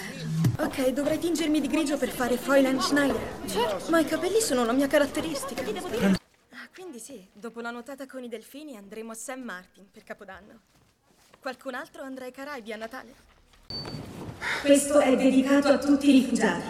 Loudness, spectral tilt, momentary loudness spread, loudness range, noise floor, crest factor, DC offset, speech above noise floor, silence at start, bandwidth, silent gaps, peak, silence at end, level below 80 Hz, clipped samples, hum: -25 LUFS; -4.5 dB/octave; 21 LU; 16 LU; -62 dBFS; 20 dB; under 0.1%; 36 dB; 0 s; 15.5 kHz; none; -8 dBFS; 0 s; -56 dBFS; under 0.1%; none